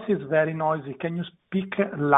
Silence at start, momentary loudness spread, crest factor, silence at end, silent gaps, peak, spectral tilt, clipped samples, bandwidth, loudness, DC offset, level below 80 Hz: 0 s; 8 LU; 22 dB; 0 s; none; -4 dBFS; -10 dB/octave; under 0.1%; 4 kHz; -27 LUFS; under 0.1%; -66 dBFS